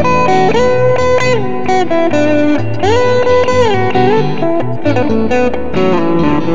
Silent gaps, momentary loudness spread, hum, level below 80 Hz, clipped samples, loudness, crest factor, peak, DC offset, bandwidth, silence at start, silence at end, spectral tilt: none; 4 LU; none; -36 dBFS; under 0.1%; -12 LUFS; 10 dB; 0 dBFS; 20%; 7.6 kHz; 0 s; 0 s; -6.5 dB/octave